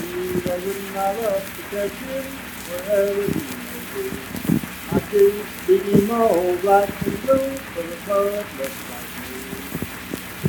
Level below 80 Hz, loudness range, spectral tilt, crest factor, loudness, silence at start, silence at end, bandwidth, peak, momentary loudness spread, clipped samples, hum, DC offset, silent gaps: -48 dBFS; 6 LU; -5.5 dB/octave; 20 dB; -23 LUFS; 0 s; 0 s; 19.5 kHz; -2 dBFS; 13 LU; under 0.1%; none; under 0.1%; none